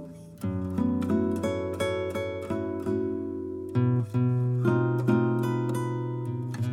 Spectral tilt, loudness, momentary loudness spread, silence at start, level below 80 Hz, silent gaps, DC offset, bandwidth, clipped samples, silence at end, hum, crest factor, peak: -8 dB/octave; -28 LUFS; 8 LU; 0 s; -60 dBFS; none; under 0.1%; 13.5 kHz; under 0.1%; 0 s; none; 16 dB; -12 dBFS